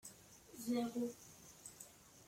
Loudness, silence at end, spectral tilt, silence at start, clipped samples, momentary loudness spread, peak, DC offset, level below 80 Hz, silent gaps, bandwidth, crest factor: -44 LUFS; 0 s; -4 dB/octave; 0.05 s; under 0.1%; 18 LU; -28 dBFS; under 0.1%; -78 dBFS; none; 16.5 kHz; 18 dB